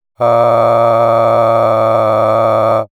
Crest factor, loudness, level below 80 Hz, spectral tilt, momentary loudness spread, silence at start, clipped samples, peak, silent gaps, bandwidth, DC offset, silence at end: 10 dB; -11 LUFS; -56 dBFS; -7.5 dB/octave; 1 LU; 0.2 s; under 0.1%; 0 dBFS; none; 12.5 kHz; under 0.1%; 0.15 s